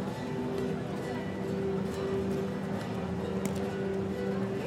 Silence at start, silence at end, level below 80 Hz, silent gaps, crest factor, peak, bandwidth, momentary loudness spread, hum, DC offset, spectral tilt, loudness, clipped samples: 0 s; 0 s; -56 dBFS; none; 18 dB; -16 dBFS; 16 kHz; 3 LU; none; under 0.1%; -7 dB/octave; -34 LUFS; under 0.1%